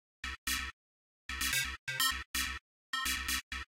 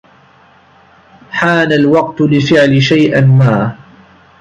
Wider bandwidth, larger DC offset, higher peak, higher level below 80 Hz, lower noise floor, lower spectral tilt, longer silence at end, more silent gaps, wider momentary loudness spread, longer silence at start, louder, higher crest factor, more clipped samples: first, 16.5 kHz vs 8 kHz; neither; second, -16 dBFS vs 0 dBFS; about the same, -50 dBFS vs -48 dBFS; first, under -90 dBFS vs -45 dBFS; second, 0 dB/octave vs -7 dB/octave; second, 0.1 s vs 0.65 s; first, 0.38-0.47 s, 0.73-1.29 s, 1.79-1.87 s, 2.26-2.34 s, 2.61-2.93 s, 3.43-3.51 s vs none; first, 12 LU vs 7 LU; second, 0.25 s vs 1.3 s; second, -35 LUFS vs -10 LUFS; first, 22 dB vs 10 dB; neither